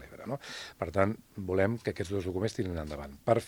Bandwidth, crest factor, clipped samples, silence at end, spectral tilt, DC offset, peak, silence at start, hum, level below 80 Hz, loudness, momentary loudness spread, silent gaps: over 20 kHz; 22 dB; under 0.1%; 0 s; -6.5 dB/octave; under 0.1%; -10 dBFS; 0 s; none; -56 dBFS; -33 LUFS; 10 LU; none